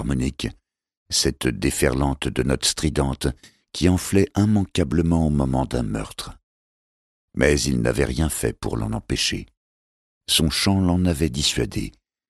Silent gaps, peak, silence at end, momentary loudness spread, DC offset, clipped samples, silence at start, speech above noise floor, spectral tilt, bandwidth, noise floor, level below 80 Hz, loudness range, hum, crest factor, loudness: 0.97-1.06 s, 6.43-7.28 s, 9.57-10.21 s; -2 dBFS; 0.4 s; 12 LU; under 0.1%; under 0.1%; 0 s; over 69 dB; -4.5 dB/octave; 14.5 kHz; under -90 dBFS; -34 dBFS; 2 LU; none; 20 dB; -22 LUFS